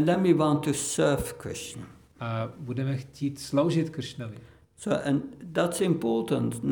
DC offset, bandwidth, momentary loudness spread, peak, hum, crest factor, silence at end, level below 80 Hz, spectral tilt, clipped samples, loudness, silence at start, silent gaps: under 0.1%; over 20 kHz; 15 LU; -10 dBFS; none; 18 dB; 0 s; -56 dBFS; -5.5 dB/octave; under 0.1%; -28 LUFS; 0 s; none